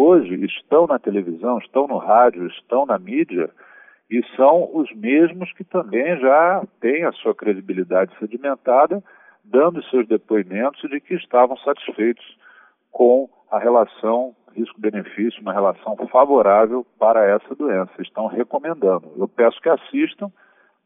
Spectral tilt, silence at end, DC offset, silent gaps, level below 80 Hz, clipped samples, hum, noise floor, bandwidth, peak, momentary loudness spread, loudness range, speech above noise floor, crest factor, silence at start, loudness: -11 dB/octave; 0.55 s; under 0.1%; none; -76 dBFS; under 0.1%; none; -51 dBFS; 3.8 kHz; -2 dBFS; 11 LU; 3 LU; 33 dB; 16 dB; 0 s; -19 LUFS